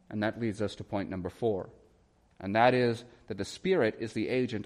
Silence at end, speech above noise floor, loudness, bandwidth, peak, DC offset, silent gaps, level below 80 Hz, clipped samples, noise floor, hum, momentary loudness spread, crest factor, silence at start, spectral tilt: 0 s; 35 dB; -31 LUFS; 12 kHz; -12 dBFS; under 0.1%; none; -64 dBFS; under 0.1%; -65 dBFS; none; 14 LU; 20 dB; 0.1 s; -6.5 dB/octave